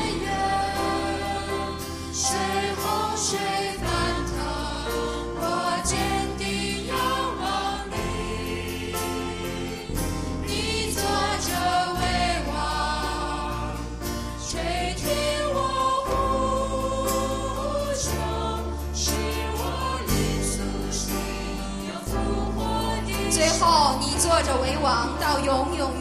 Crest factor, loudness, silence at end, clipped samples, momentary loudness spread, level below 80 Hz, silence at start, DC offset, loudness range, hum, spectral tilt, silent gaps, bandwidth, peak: 20 dB; -26 LUFS; 0 s; under 0.1%; 7 LU; -34 dBFS; 0 s; under 0.1%; 5 LU; none; -3.5 dB/octave; none; 15.5 kHz; -6 dBFS